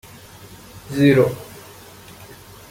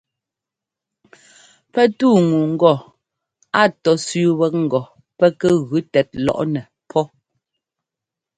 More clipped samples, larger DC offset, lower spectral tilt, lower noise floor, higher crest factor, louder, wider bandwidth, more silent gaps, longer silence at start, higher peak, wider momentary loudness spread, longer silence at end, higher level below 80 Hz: neither; neither; about the same, -7 dB/octave vs -6 dB/octave; second, -42 dBFS vs -86 dBFS; about the same, 20 dB vs 18 dB; about the same, -17 LUFS vs -18 LUFS; first, 17 kHz vs 10.5 kHz; neither; second, 0.75 s vs 1.75 s; about the same, -2 dBFS vs 0 dBFS; first, 27 LU vs 9 LU; about the same, 1.25 s vs 1.3 s; first, -52 dBFS vs -58 dBFS